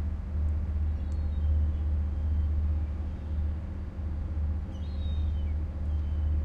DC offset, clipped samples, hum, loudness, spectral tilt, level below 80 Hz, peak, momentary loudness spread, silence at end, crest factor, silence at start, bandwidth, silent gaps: under 0.1%; under 0.1%; none; -32 LUFS; -9.5 dB/octave; -30 dBFS; -18 dBFS; 6 LU; 0 s; 10 dB; 0 s; 4 kHz; none